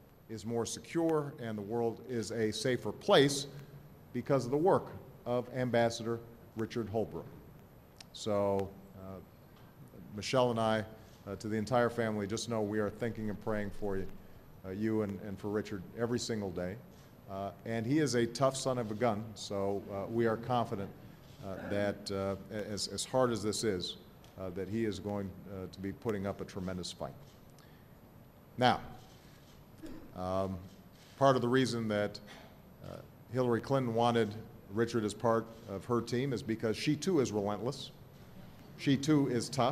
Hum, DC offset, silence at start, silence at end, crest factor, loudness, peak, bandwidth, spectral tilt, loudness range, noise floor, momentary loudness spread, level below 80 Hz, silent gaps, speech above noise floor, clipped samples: none; under 0.1%; 0 s; 0 s; 24 dB; -34 LUFS; -10 dBFS; 15 kHz; -5.5 dB/octave; 6 LU; -57 dBFS; 19 LU; -60 dBFS; none; 23 dB; under 0.1%